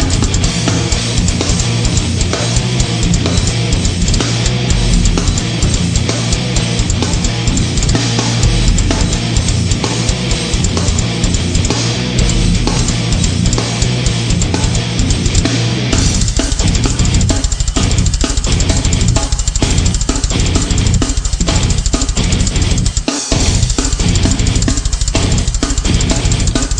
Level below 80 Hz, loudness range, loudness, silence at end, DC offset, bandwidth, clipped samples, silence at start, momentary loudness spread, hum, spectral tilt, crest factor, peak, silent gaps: -16 dBFS; 1 LU; -14 LUFS; 0 s; under 0.1%; 9.8 kHz; under 0.1%; 0 s; 2 LU; none; -4 dB/octave; 12 dB; 0 dBFS; none